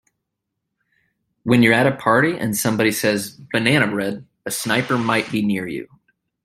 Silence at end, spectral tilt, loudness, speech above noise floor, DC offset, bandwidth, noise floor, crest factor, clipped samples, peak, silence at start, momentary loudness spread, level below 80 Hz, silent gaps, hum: 0.6 s; -4.5 dB/octave; -19 LUFS; 60 dB; under 0.1%; 16 kHz; -79 dBFS; 20 dB; under 0.1%; 0 dBFS; 1.45 s; 12 LU; -58 dBFS; none; none